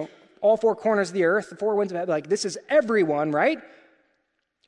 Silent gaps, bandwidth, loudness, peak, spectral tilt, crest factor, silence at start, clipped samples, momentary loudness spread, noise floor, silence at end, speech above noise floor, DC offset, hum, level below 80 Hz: none; 11 kHz; -23 LUFS; -8 dBFS; -5 dB/octave; 16 dB; 0 s; under 0.1%; 6 LU; -74 dBFS; 1 s; 52 dB; under 0.1%; none; -72 dBFS